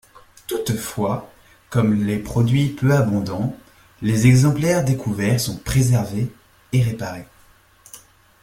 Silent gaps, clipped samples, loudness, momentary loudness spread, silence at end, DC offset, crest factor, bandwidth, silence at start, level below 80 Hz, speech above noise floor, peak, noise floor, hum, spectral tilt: none; under 0.1%; -20 LUFS; 13 LU; 0.45 s; under 0.1%; 18 dB; 16.5 kHz; 0.5 s; -44 dBFS; 34 dB; -2 dBFS; -53 dBFS; none; -6.5 dB/octave